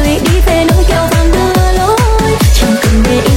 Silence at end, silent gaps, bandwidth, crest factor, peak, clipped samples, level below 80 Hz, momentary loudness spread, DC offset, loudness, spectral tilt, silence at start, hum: 0 s; none; 17 kHz; 8 dB; 0 dBFS; under 0.1%; -12 dBFS; 1 LU; under 0.1%; -10 LUFS; -5.5 dB/octave; 0 s; none